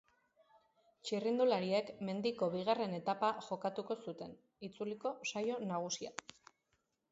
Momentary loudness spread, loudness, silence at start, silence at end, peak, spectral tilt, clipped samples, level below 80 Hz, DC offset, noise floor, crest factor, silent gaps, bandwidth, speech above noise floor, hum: 16 LU; -38 LUFS; 1.05 s; 1 s; -20 dBFS; -4 dB/octave; under 0.1%; -82 dBFS; under 0.1%; -82 dBFS; 20 dB; none; 7.6 kHz; 44 dB; none